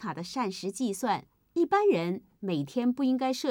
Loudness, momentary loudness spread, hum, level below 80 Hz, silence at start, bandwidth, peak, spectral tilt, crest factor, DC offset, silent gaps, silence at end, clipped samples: -29 LUFS; 10 LU; none; -72 dBFS; 0 s; 16.5 kHz; -14 dBFS; -5.5 dB/octave; 16 dB; under 0.1%; none; 0 s; under 0.1%